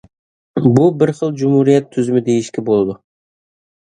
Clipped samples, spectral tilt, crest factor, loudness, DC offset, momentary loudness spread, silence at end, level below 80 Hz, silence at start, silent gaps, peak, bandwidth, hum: under 0.1%; -8 dB/octave; 16 dB; -15 LUFS; under 0.1%; 7 LU; 1 s; -54 dBFS; 0.55 s; none; 0 dBFS; 10 kHz; none